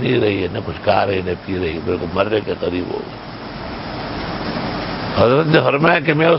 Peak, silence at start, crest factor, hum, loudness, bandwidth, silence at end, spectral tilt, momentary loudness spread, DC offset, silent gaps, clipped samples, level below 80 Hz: 0 dBFS; 0 s; 18 dB; none; -18 LUFS; 5.8 kHz; 0 s; -10 dB/octave; 13 LU; under 0.1%; none; under 0.1%; -40 dBFS